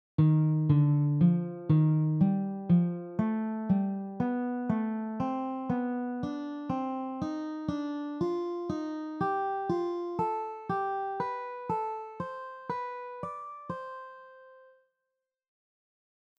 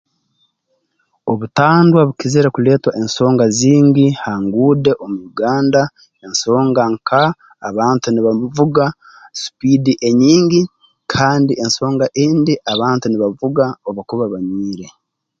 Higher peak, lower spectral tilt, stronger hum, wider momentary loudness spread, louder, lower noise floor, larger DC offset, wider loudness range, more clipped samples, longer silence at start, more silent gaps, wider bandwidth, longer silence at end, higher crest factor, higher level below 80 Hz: second, -14 dBFS vs 0 dBFS; first, -10 dB/octave vs -6 dB/octave; neither; about the same, 14 LU vs 12 LU; second, -31 LUFS vs -14 LUFS; first, -86 dBFS vs -67 dBFS; neither; first, 13 LU vs 4 LU; neither; second, 0.2 s vs 1.25 s; neither; second, 6 kHz vs 7.8 kHz; first, 1.8 s vs 0.5 s; about the same, 16 dB vs 14 dB; second, -64 dBFS vs -52 dBFS